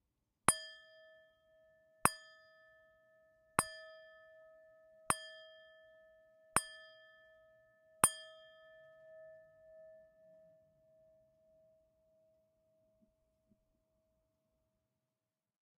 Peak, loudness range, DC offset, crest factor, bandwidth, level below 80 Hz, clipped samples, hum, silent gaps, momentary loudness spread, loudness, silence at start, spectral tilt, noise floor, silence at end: -6 dBFS; 4 LU; under 0.1%; 40 dB; 13 kHz; -72 dBFS; under 0.1%; none; none; 28 LU; -36 LUFS; 0.5 s; -1.5 dB/octave; under -90 dBFS; 6.5 s